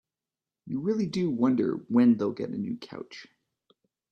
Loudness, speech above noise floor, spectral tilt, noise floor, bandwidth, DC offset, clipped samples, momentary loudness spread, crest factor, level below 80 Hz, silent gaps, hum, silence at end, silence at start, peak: -27 LUFS; over 63 dB; -8 dB/octave; under -90 dBFS; 7.4 kHz; under 0.1%; under 0.1%; 19 LU; 16 dB; -72 dBFS; none; none; 0.85 s; 0.65 s; -12 dBFS